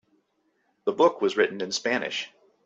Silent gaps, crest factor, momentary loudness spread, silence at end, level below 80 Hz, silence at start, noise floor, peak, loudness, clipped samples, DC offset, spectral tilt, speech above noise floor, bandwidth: none; 20 dB; 10 LU; 0.4 s; -74 dBFS; 0.85 s; -71 dBFS; -6 dBFS; -25 LUFS; under 0.1%; under 0.1%; -3 dB/octave; 47 dB; 8.2 kHz